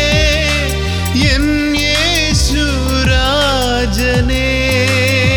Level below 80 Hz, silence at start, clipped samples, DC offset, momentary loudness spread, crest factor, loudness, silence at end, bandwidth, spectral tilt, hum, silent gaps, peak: -20 dBFS; 0 s; under 0.1%; under 0.1%; 3 LU; 12 dB; -13 LUFS; 0 s; 18.5 kHz; -4 dB/octave; none; none; 0 dBFS